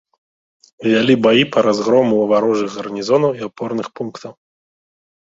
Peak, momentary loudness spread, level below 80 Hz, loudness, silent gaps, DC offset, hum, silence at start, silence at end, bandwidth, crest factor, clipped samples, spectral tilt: 0 dBFS; 15 LU; -60 dBFS; -16 LUFS; none; under 0.1%; none; 0.8 s; 0.9 s; 7.8 kHz; 16 dB; under 0.1%; -5.5 dB/octave